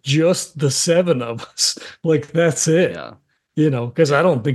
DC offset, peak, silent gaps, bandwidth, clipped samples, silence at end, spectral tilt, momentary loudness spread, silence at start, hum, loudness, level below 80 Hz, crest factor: under 0.1%; -2 dBFS; none; 12.5 kHz; under 0.1%; 0 s; -4.5 dB/octave; 9 LU; 0.05 s; none; -18 LUFS; -62 dBFS; 16 dB